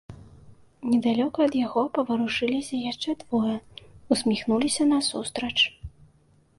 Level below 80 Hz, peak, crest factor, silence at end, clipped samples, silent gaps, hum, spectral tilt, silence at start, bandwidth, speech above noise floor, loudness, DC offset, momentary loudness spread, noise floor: -56 dBFS; -8 dBFS; 20 dB; 0.7 s; under 0.1%; none; none; -3.5 dB/octave; 0.1 s; 11.5 kHz; 36 dB; -25 LUFS; under 0.1%; 8 LU; -61 dBFS